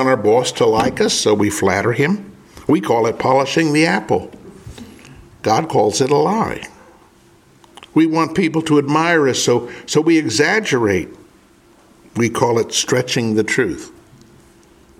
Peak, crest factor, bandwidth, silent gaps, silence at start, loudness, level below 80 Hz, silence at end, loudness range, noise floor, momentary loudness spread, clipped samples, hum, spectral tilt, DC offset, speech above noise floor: 0 dBFS; 18 dB; 15.5 kHz; none; 0 s; -16 LUFS; -50 dBFS; 1.1 s; 4 LU; -49 dBFS; 10 LU; under 0.1%; none; -4.5 dB/octave; under 0.1%; 34 dB